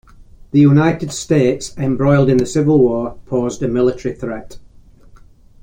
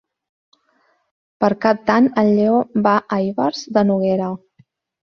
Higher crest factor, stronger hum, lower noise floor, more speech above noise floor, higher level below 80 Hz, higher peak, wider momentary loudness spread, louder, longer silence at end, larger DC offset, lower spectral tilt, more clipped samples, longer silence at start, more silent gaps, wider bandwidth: about the same, 14 dB vs 18 dB; neither; second, -43 dBFS vs -62 dBFS; second, 29 dB vs 46 dB; first, -42 dBFS vs -58 dBFS; about the same, -2 dBFS vs -2 dBFS; first, 12 LU vs 7 LU; about the same, -15 LUFS vs -17 LUFS; first, 1.05 s vs 0.7 s; neither; about the same, -7 dB/octave vs -7 dB/octave; neither; second, 0.55 s vs 1.4 s; neither; first, 15.5 kHz vs 6.8 kHz